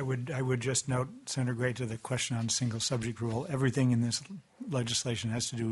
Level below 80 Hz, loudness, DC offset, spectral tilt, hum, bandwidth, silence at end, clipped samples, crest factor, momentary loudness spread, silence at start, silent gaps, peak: -62 dBFS; -32 LUFS; under 0.1%; -4.5 dB/octave; none; 11.5 kHz; 0 s; under 0.1%; 16 dB; 7 LU; 0 s; none; -16 dBFS